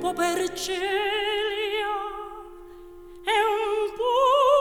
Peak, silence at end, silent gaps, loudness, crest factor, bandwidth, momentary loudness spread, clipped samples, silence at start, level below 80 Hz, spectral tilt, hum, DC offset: -8 dBFS; 0 s; none; -24 LUFS; 16 dB; 19 kHz; 17 LU; under 0.1%; 0 s; -52 dBFS; -2 dB/octave; none; under 0.1%